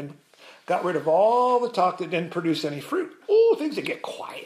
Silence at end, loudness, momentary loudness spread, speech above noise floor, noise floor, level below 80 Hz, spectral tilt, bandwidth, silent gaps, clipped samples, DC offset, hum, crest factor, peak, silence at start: 0 s; -23 LUFS; 11 LU; 27 dB; -51 dBFS; -80 dBFS; -6 dB/octave; 14.5 kHz; none; under 0.1%; under 0.1%; none; 14 dB; -10 dBFS; 0 s